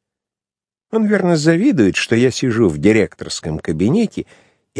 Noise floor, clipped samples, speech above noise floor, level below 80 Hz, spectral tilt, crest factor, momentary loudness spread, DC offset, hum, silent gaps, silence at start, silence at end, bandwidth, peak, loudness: under -90 dBFS; under 0.1%; over 75 dB; -46 dBFS; -6 dB/octave; 16 dB; 10 LU; under 0.1%; none; none; 0.95 s; 0 s; 10.5 kHz; 0 dBFS; -16 LUFS